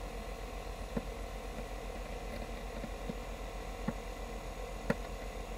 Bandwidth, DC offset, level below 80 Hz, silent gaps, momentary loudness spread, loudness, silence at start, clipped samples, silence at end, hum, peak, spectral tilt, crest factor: 16 kHz; under 0.1%; -44 dBFS; none; 6 LU; -43 LUFS; 0 s; under 0.1%; 0 s; none; -16 dBFS; -5.5 dB/octave; 26 dB